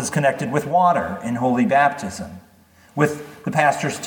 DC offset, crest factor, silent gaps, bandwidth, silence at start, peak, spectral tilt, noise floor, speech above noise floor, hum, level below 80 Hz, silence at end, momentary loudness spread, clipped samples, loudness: under 0.1%; 18 dB; none; 19 kHz; 0 s; -2 dBFS; -5.5 dB/octave; -52 dBFS; 32 dB; none; -56 dBFS; 0 s; 13 LU; under 0.1%; -20 LUFS